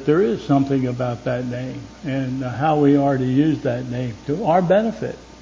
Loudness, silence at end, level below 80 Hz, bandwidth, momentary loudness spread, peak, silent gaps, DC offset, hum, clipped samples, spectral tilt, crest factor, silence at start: -20 LUFS; 0 s; -48 dBFS; 7.6 kHz; 11 LU; -4 dBFS; none; under 0.1%; none; under 0.1%; -8 dB/octave; 16 dB; 0 s